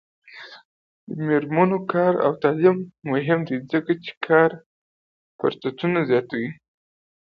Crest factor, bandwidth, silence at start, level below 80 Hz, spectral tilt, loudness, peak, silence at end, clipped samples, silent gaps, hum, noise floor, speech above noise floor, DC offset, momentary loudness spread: 20 dB; 5.4 kHz; 0.35 s; -66 dBFS; -9.5 dB/octave; -22 LUFS; -2 dBFS; 0.85 s; under 0.1%; 0.65-1.07 s, 4.17-4.21 s, 4.66-5.39 s; none; under -90 dBFS; over 69 dB; under 0.1%; 16 LU